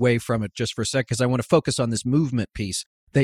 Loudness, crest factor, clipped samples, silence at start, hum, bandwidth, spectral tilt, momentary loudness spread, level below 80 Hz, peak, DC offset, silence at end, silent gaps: -24 LUFS; 18 dB; under 0.1%; 0 s; none; 14 kHz; -5.5 dB/octave; 7 LU; -50 dBFS; -4 dBFS; under 0.1%; 0 s; 2.86-3.07 s